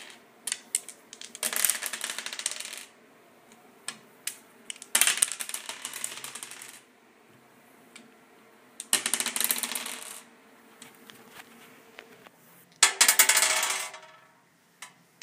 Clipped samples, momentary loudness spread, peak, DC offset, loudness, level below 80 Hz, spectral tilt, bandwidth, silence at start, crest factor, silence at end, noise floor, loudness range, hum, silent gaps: under 0.1%; 28 LU; 0 dBFS; under 0.1%; -26 LUFS; -84 dBFS; 2.5 dB/octave; 16 kHz; 0 s; 32 dB; 0.35 s; -62 dBFS; 12 LU; none; none